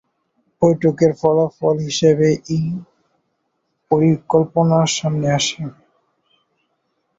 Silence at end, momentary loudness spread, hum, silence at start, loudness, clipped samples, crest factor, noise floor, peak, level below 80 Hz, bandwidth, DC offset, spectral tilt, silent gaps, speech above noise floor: 1.45 s; 7 LU; none; 0.6 s; -17 LUFS; under 0.1%; 18 dB; -70 dBFS; -2 dBFS; -54 dBFS; 8 kHz; under 0.1%; -5.5 dB/octave; none; 54 dB